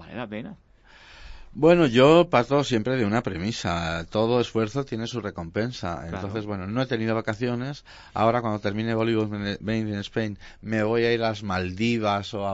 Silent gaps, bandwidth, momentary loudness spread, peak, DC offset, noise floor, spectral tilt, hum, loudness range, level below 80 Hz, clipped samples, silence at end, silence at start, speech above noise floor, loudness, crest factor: none; 8 kHz; 14 LU; -4 dBFS; under 0.1%; -51 dBFS; -6.5 dB/octave; none; 6 LU; -50 dBFS; under 0.1%; 0 s; 0 s; 26 dB; -24 LUFS; 20 dB